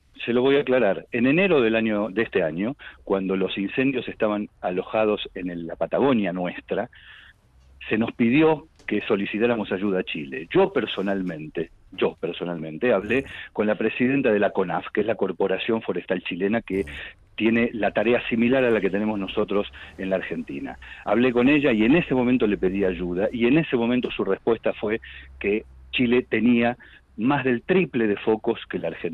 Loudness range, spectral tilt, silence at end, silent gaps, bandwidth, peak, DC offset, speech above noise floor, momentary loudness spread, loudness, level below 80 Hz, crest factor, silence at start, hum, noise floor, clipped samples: 4 LU; -8.5 dB/octave; 0 s; none; 4.3 kHz; -10 dBFS; under 0.1%; 31 dB; 11 LU; -23 LUFS; -52 dBFS; 14 dB; 0.2 s; none; -54 dBFS; under 0.1%